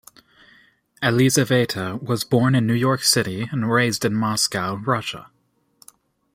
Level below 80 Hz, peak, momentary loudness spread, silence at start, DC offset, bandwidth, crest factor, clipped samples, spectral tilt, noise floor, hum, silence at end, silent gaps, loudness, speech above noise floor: -58 dBFS; -4 dBFS; 8 LU; 1 s; under 0.1%; 16.5 kHz; 18 dB; under 0.1%; -4.5 dB/octave; -66 dBFS; none; 1.15 s; none; -20 LUFS; 46 dB